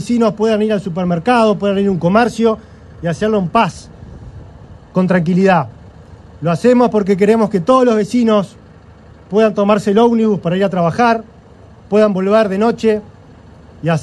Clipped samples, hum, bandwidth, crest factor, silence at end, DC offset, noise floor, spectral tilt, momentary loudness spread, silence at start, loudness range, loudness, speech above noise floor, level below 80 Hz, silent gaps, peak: under 0.1%; none; 11.5 kHz; 14 dB; 0 s; under 0.1%; -40 dBFS; -7 dB/octave; 10 LU; 0 s; 3 LU; -14 LUFS; 28 dB; -44 dBFS; none; 0 dBFS